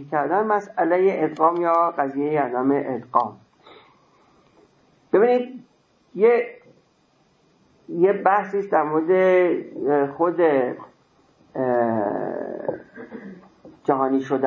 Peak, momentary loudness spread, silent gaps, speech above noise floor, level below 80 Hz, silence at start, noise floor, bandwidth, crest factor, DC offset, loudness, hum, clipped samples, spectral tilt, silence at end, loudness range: -2 dBFS; 15 LU; none; 41 dB; -72 dBFS; 0 s; -62 dBFS; 7 kHz; 20 dB; under 0.1%; -21 LUFS; none; under 0.1%; -8.5 dB/octave; 0 s; 5 LU